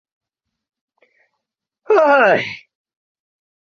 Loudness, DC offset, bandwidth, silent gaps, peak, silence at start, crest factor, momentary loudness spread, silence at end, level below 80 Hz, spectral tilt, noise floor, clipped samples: -14 LUFS; under 0.1%; 7 kHz; none; -2 dBFS; 1.9 s; 18 dB; 17 LU; 1.1 s; -68 dBFS; -5.5 dB/octave; -80 dBFS; under 0.1%